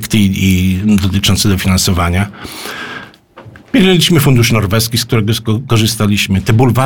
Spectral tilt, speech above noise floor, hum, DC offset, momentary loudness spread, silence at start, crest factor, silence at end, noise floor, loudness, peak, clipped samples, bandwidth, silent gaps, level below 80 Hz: -5 dB/octave; 26 dB; none; 1%; 14 LU; 0 s; 12 dB; 0 s; -37 dBFS; -11 LUFS; 0 dBFS; under 0.1%; 19 kHz; none; -32 dBFS